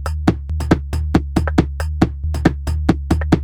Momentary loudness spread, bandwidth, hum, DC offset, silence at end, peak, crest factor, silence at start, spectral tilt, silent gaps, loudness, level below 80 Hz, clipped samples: 2 LU; 13 kHz; none; under 0.1%; 0 s; 0 dBFS; 16 dB; 0 s; -7.5 dB/octave; none; -19 LUFS; -22 dBFS; under 0.1%